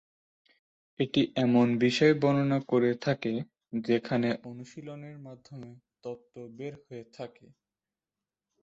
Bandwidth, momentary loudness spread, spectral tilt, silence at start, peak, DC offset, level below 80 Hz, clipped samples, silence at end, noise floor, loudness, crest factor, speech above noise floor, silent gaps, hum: 7.8 kHz; 22 LU; -6.5 dB/octave; 1 s; -10 dBFS; under 0.1%; -70 dBFS; under 0.1%; 1.35 s; under -90 dBFS; -27 LUFS; 20 dB; over 61 dB; none; none